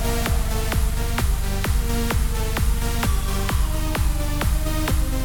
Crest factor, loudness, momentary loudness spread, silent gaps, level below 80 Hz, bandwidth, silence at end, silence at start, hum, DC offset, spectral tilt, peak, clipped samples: 12 dB; -24 LUFS; 1 LU; none; -22 dBFS; 19.5 kHz; 0 s; 0 s; 50 Hz at -30 dBFS; 0.1%; -4.5 dB/octave; -8 dBFS; under 0.1%